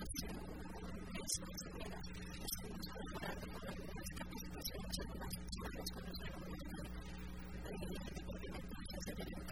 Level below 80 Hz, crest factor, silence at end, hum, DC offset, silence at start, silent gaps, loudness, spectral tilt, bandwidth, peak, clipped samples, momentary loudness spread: -52 dBFS; 24 dB; 0 s; none; 0.2%; 0 s; none; -47 LUFS; -4 dB/octave; 19.5 kHz; -24 dBFS; under 0.1%; 5 LU